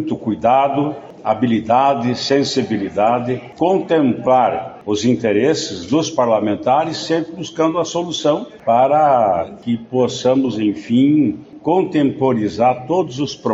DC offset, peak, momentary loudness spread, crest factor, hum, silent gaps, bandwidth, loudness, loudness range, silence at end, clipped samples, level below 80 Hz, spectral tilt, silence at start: under 0.1%; -2 dBFS; 7 LU; 14 dB; none; none; 8 kHz; -17 LUFS; 2 LU; 0 s; under 0.1%; -56 dBFS; -5 dB/octave; 0 s